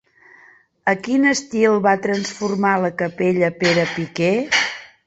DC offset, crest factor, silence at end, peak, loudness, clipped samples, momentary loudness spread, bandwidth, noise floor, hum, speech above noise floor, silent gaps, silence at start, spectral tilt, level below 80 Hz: under 0.1%; 18 dB; 0.2 s; -2 dBFS; -19 LUFS; under 0.1%; 6 LU; 8.2 kHz; -51 dBFS; none; 33 dB; none; 0.85 s; -4.5 dB/octave; -60 dBFS